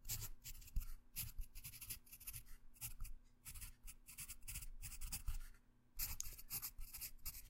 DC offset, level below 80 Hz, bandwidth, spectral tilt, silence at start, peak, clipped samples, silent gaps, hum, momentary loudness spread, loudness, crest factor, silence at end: under 0.1%; -52 dBFS; 16 kHz; -1.5 dB/octave; 0 s; -24 dBFS; under 0.1%; none; none; 10 LU; -51 LUFS; 26 dB; 0 s